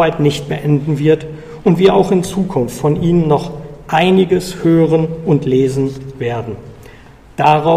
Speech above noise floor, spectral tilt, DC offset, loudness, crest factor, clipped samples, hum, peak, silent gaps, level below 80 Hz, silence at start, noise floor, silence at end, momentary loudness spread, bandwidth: 26 dB; -7 dB/octave; under 0.1%; -14 LUFS; 14 dB; under 0.1%; none; 0 dBFS; none; -40 dBFS; 0 s; -39 dBFS; 0 s; 12 LU; 15 kHz